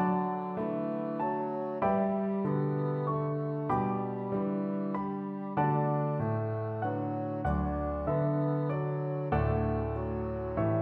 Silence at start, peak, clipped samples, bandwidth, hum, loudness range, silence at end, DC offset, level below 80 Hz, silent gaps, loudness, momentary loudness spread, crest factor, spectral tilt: 0 s; -16 dBFS; under 0.1%; 4.4 kHz; none; 1 LU; 0 s; under 0.1%; -46 dBFS; none; -32 LUFS; 5 LU; 14 dB; -11.5 dB/octave